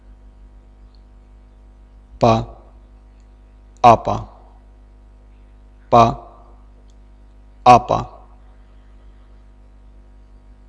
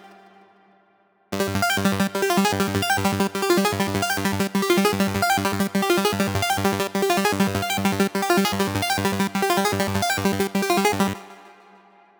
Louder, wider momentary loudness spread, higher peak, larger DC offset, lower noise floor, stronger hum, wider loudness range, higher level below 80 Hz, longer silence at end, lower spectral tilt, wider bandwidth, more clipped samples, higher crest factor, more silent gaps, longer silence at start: first, -15 LUFS vs -21 LUFS; first, 23 LU vs 3 LU; first, 0 dBFS vs -4 dBFS; neither; second, -45 dBFS vs -61 dBFS; first, 50 Hz at -40 dBFS vs none; first, 7 LU vs 1 LU; first, -40 dBFS vs -52 dBFS; first, 2.6 s vs 0.7 s; first, -6.5 dB/octave vs -4.5 dB/octave; second, 11 kHz vs over 20 kHz; neither; about the same, 20 dB vs 18 dB; neither; first, 2.2 s vs 0.05 s